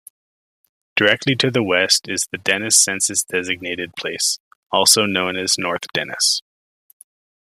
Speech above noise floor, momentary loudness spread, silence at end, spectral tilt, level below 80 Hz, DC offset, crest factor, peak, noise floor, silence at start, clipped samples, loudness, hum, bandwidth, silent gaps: over 71 dB; 11 LU; 1.05 s; -1.5 dB/octave; -64 dBFS; under 0.1%; 20 dB; 0 dBFS; under -90 dBFS; 0.95 s; under 0.1%; -17 LUFS; none; 15.5 kHz; 4.40-4.70 s